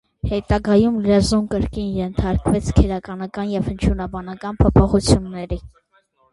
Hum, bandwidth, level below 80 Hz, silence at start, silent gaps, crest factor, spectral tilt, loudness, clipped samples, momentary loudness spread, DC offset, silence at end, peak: none; 11.5 kHz; -28 dBFS; 0.25 s; none; 18 dB; -7 dB/octave; -19 LUFS; under 0.1%; 13 LU; under 0.1%; 0.65 s; 0 dBFS